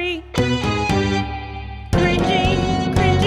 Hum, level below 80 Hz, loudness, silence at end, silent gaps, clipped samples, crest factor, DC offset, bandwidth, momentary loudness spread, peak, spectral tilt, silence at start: none; -30 dBFS; -19 LUFS; 0 s; none; under 0.1%; 14 dB; under 0.1%; 13.5 kHz; 11 LU; -4 dBFS; -6 dB/octave; 0 s